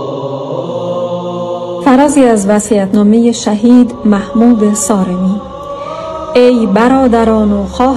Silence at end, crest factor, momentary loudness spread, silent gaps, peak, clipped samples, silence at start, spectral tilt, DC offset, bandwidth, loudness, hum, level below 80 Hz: 0 s; 10 dB; 12 LU; none; 0 dBFS; 2%; 0 s; -6 dB/octave; under 0.1%; 12.5 kHz; -10 LUFS; none; -36 dBFS